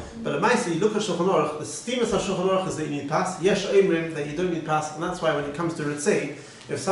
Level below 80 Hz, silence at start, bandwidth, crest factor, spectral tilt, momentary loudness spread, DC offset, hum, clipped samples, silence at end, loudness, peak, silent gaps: -56 dBFS; 0 s; 11.5 kHz; 16 dB; -5 dB/octave; 9 LU; under 0.1%; none; under 0.1%; 0 s; -25 LUFS; -8 dBFS; none